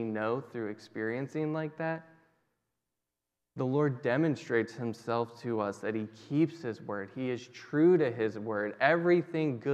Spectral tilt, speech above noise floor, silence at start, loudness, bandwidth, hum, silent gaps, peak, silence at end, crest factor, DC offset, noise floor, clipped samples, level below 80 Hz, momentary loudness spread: -7.5 dB/octave; 57 dB; 0 s; -32 LUFS; 8.8 kHz; none; none; -10 dBFS; 0 s; 22 dB; under 0.1%; -88 dBFS; under 0.1%; -84 dBFS; 12 LU